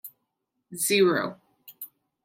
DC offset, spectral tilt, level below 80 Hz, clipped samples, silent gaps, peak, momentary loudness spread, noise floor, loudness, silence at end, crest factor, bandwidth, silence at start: under 0.1%; -3.5 dB/octave; -78 dBFS; under 0.1%; none; -10 dBFS; 21 LU; -80 dBFS; -24 LUFS; 0.4 s; 18 dB; 16.5 kHz; 0.05 s